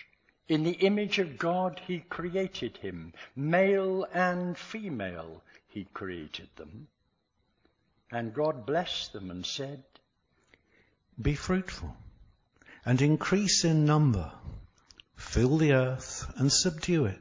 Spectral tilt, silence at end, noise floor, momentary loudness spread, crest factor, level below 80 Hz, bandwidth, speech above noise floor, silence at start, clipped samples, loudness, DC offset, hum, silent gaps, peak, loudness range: -5 dB/octave; 0 s; -76 dBFS; 19 LU; 18 dB; -50 dBFS; 7.6 kHz; 46 dB; 0.5 s; under 0.1%; -29 LUFS; under 0.1%; none; none; -12 dBFS; 11 LU